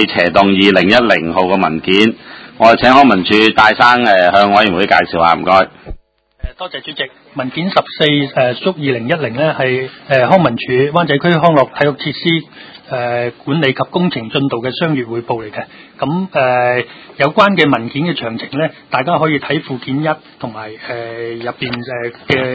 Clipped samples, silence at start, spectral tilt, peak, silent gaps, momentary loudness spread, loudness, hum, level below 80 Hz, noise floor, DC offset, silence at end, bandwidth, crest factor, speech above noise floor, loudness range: 0.4%; 0 s; -6.5 dB/octave; 0 dBFS; none; 14 LU; -13 LUFS; none; -42 dBFS; -40 dBFS; under 0.1%; 0 s; 8 kHz; 14 dB; 27 dB; 8 LU